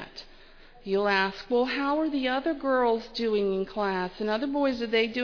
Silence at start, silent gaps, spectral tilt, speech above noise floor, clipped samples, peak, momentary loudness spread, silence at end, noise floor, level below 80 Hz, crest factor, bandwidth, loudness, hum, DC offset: 0 s; none; -6 dB/octave; 24 dB; under 0.1%; -12 dBFS; 5 LU; 0 s; -51 dBFS; -54 dBFS; 16 dB; 5.4 kHz; -27 LUFS; none; under 0.1%